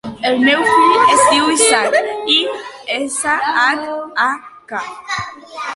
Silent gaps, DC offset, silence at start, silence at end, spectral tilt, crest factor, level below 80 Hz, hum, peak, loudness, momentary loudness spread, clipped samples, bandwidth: none; under 0.1%; 0.05 s; 0 s; -1 dB/octave; 16 dB; -56 dBFS; none; 0 dBFS; -14 LUFS; 16 LU; under 0.1%; 11.5 kHz